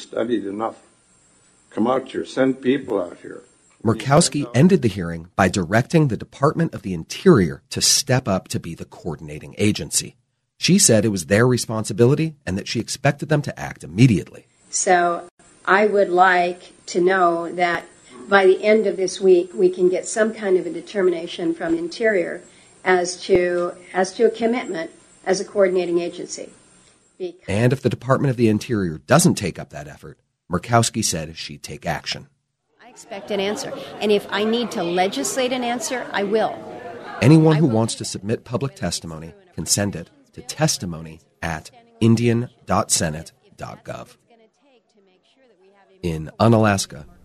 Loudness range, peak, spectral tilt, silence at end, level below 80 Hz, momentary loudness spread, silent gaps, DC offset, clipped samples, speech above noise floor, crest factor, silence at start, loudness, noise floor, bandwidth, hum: 6 LU; 0 dBFS; -4.5 dB/octave; 0.2 s; -52 dBFS; 17 LU; 15.31-15.38 s; under 0.1%; under 0.1%; 41 dB; 20 dB; 0 s; -20 LUFS; -61 dBFS; 13.5 kHz; none